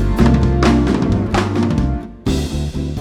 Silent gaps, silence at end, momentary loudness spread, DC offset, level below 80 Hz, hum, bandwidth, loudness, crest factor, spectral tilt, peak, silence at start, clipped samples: none; 0 s; 8 LU; under 0.1%; -22 dBFS; none; 13 kHz; -16 LUFS; 14 dB; -7 dB/octave; -2 dBFS; 0 s; under 0.1%